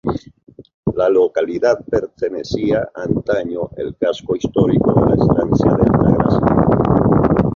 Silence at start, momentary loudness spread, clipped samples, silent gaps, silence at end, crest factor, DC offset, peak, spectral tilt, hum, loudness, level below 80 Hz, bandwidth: 0.05 s; 10 LU; under 0.1%; 0.74-0.83 s; 0 s; 14 dB; under 0.1%; 0 dBFS; -9 dB/octave; none; -16 LUFS; -34 dBFS; 7.2 kHz